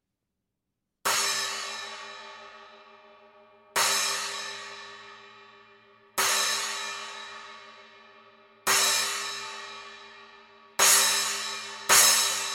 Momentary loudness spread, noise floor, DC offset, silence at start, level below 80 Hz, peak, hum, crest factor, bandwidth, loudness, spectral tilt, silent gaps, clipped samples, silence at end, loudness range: 24 LU; -83 dBFS; under 0.1%; 1.05 s; -74 dBFS; -6 dBFS; none; 24 dB; 17 kHz; -24 LUFS; 2 dB/octave; none; under 0.1%; 0 s; 7 LU